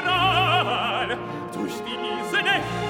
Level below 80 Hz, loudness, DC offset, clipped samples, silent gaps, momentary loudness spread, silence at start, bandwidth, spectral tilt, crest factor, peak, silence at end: -50 dBFS; -23 LUFS; under 0.1%; under 0.1%; none; 11 LU; 0 s; 17 kHz; -4.5 dB/octave; 16 dB; -8 dBFS; 0 s